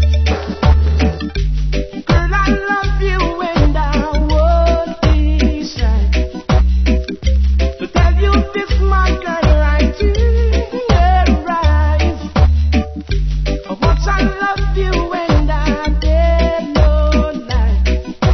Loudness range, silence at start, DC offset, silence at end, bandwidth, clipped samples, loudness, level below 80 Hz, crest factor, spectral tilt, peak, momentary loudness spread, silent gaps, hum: 2 LU; 0 s; under 0.1%; 0 s; 6.4 kHz; under 0.1%; -15 LUFS; -14 dBFS; 12 dB; -7 dB/octave; 0 dBFS; 5 LU; none; none